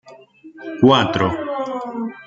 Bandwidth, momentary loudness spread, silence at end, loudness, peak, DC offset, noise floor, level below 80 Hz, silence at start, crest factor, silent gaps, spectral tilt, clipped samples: 7.6 kHz; 17 LU; 0.05 s; -18 LUFS; -2 dBFS; under 0.1%; -43 dBFS; -54 dBFS; 0.05 s; 18 dB; none; -6.5 dB/octave; under 0.1%